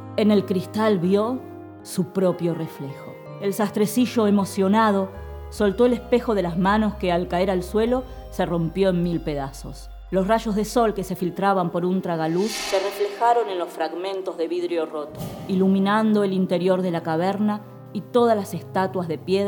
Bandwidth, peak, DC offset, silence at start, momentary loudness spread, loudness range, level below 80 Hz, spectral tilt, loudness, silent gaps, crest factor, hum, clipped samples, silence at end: 19 kHz; -6 dBFS; under 0.1%; 0 s; 12 LU; 3 LU; -44 dBFS; -6.5 dB/octave; -22 LUFS; none; 16 dB; none; under 0.1%; 0 s